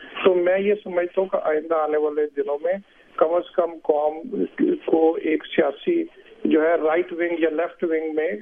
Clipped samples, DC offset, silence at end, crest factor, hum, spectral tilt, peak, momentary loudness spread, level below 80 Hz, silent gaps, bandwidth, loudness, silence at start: under 0.1%; under 0.1%; 0 s; 18 dB; none; -8.5 dB/octave; -4 dBFS; 6 LU; -66 dBFS; none; 3.7 kHz; -22 LUFS; 0 s